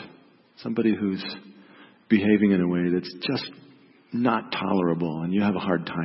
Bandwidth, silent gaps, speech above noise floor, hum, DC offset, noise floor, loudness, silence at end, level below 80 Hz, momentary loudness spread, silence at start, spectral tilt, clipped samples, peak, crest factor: 5.8 kHz; none; 30 dB; none; under 0.1%; -54 dBFS; -25 LUFS; 0 s; -64 dBFS; 13 LU; 0 s; -10.5 dB/octave; under 0.1%; -6 dBFS; 18 dB